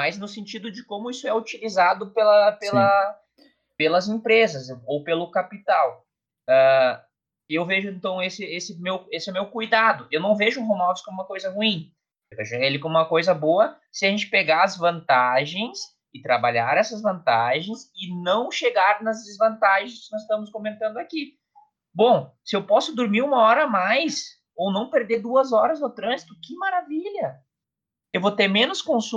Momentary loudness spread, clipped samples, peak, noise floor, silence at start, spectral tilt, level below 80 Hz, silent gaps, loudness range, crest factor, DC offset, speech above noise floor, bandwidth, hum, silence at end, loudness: 14 LU; under 0.1%; -6 dBFS; -87 dBFS; 0 s; -4.5 dB/octave; -76 dBFS; none; 4 LU; 16 dB; under 0.1%; 65 dB; 8.2 kHz; none; 0 s; -22 LUFS